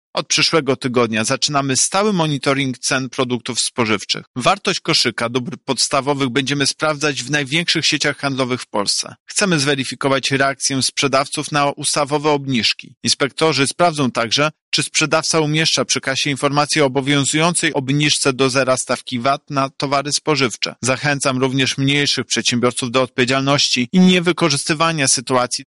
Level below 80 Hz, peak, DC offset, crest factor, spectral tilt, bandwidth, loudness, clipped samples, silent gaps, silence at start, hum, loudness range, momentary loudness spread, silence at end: -56 dBFS; -2 dBFS; under 0.1%; 16 dB; -3.5 dB/octave; 11.5 kHz; -17 LUFS; under 0.1%; 4.27-4.34 s, 9.20-9.26 s, 12.97-13.01 s, 14.61-14.72 s; 0.15 s; none; 2 LU; 5 LU; 0.05 s